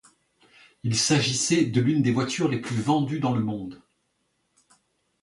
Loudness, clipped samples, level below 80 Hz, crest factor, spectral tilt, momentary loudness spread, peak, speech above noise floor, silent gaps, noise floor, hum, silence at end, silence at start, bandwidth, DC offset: -24 LUFS; under 0.1%; -60 dBFS; 18 dB; -4.5 dB/octave; 9 LU; -8 dBFS; 49 dB; none; -73 dBFS; none; 1.45 s; 0.85 s; 11.5 kHz; under 0.1%